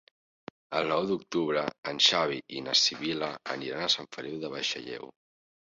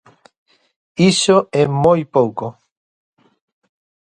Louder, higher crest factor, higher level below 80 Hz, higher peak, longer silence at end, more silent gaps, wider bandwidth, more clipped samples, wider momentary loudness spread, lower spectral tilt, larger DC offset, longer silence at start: second, -28 LUFS vs -15 LUFS; about the same, 22 dB vs 18 dB; second, -72 dBFS vs -54 dBFS; second, -8 dBFS vs 0 dBFS; second, 0.6 s vs 1.55 s; first, 1.78-1.83 s vs none; second, 8 kHz vs 11 kHz; neither; about the same, 14 LU vs 15 LU; second, -2.5 dB/octave vs -5 dB/octave; neither; second, 0.7 s vs 1 s